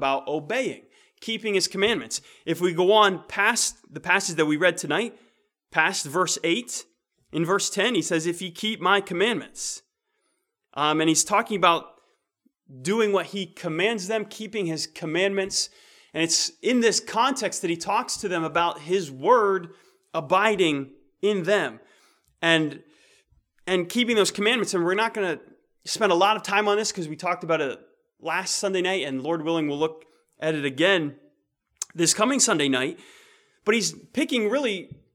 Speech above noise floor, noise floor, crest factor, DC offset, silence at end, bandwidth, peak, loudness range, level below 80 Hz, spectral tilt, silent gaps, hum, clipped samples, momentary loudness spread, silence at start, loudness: 51 dB; -75 dBFS; 22 dB; under 0.1%; 0.3 s; 17 kHz; -4 dBFS; 4 LU; -68 dBFS; -3 dB/octave; none; none; under 0.1%; 11 LU; 0 s; -24 LUFS